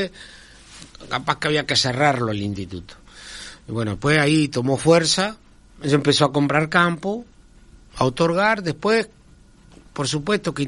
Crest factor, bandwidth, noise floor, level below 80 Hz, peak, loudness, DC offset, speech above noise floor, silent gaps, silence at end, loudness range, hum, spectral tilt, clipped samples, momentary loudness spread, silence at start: 20 dB; 11.5 kHz; -50 dBFS; -50 dBFS; -2 dBFS; -20 LUFS; under 0.1%; 29 dB; none; 0 s; 4 LU; none; -4.5 dB/octave; under 0.1%; 19 LU; 0 s